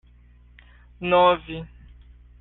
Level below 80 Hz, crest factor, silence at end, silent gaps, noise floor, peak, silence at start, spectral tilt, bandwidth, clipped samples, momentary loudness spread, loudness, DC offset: -48 dBFS; 20 dB; 0.75 s; none; -52 dBFS; -6 dBFS; 1 s; -3 dB/octave; 4.1 kHz; under 0.1%; 19 LU; -20 LUFS; under 0.1%